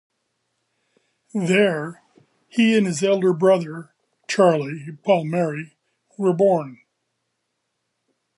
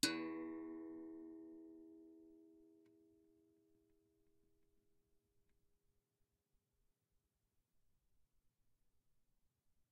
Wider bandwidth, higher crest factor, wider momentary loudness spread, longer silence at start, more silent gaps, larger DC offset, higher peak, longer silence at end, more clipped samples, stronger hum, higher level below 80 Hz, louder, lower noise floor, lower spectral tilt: first, 11.5 kHz vs 3.9 kHz; second, 18 dB vs 36 dB; second, 16 LU vs 20 LU; first, 1.35 s vs 0.05 s; neither; neither; first, -4 dBFS vs -18 dBFS; second, 1.65 s vs 6.75 s; neither; neither; first, -74 dBFS vs -86 dBFS; first, -20 LUFS vs -49 LUFS; second, -76 dBFS vs -86 dBFS; first, -6 dB/octave vs -2 dB/octave